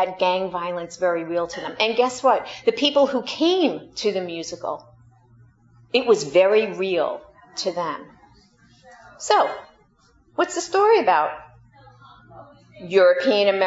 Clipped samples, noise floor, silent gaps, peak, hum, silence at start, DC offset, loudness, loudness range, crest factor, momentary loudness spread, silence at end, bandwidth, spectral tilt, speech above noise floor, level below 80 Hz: under 0.1%; -58 dBFS; none; -4 dBFS; none; 0 s; under 0.1%; -21 LUFS; 5 LU; 18 dB; 14 LU; 0 s; 8 kHz; -3.5 dB/octave; 38 dB; -64 dBFS